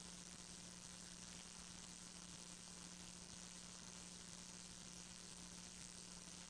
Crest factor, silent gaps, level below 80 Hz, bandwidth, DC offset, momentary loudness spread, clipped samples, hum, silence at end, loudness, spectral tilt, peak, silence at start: 20 dB; none; -72 dBFS; 10.5 kHz; under 0.1%; 1 LU; under 0.1%; none; 0 s; -54 LUFS; -2 dB/octave; -38 dBFS; 0 s